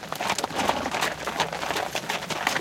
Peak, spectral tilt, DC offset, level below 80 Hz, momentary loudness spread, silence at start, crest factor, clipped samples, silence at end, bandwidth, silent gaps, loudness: -6 dBFS; -2 dB/octave; under 0.1%; -56 dBFS; 3 LU; 0 s; 22 dB; under 0.1%; 0 s; 17 kHz; none; -27 LUFS